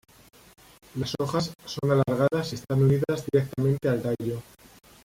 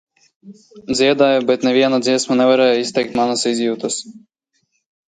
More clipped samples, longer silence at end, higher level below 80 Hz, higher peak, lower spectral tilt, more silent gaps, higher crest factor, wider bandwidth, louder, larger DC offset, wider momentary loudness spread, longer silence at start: neither; second, 0.6 s vs 0.9 s; about the same, -56 dBFS vs -60 dBFS; second, -10 dBFS vs -2 dBFS; first, -7 dB/octave vs -3.5 dB/octave; neither; about the same, 16 dB vs 16 dB; first, 16 kHz vs 9.4 kHz; second, -26 LUFS vs -16 LUFS; neither; about the same, 10 LU vs 10 LU; first, 0.95 s vs 0.45 s